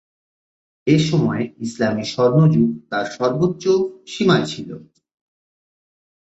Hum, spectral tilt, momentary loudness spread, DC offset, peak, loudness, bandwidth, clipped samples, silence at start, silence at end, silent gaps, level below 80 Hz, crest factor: none; -6.5 dB/octave; 12 LU; under 0.1%; -2 dBFS; -19 LUFS; 8 kHz; under 0.1%; 0.85 s; 1.5 s; none; -56 dBFS; 18 dB